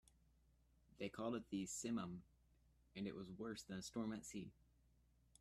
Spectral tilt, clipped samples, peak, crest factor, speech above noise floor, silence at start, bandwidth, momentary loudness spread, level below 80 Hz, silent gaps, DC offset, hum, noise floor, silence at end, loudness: -4.5 dB/octave; under 0.1%; -34 dBFS; 18 dB; 28 dB; 1 s; 15 kHz; 9 LU; -74 dBFS; none; under 0.1%; none; -76 dBFS; 0.9 s; -49 LUFS